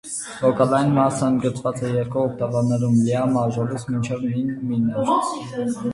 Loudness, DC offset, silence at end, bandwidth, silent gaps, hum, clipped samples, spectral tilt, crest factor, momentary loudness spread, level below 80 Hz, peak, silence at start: -21 LUFS; under 0.1%; 0 s; 11.5 kHz; none; none; under 0.1%; -7 dB/octave; 18 dB; 7 LU; -54 dBFS; -4 dBFS; 0.05 s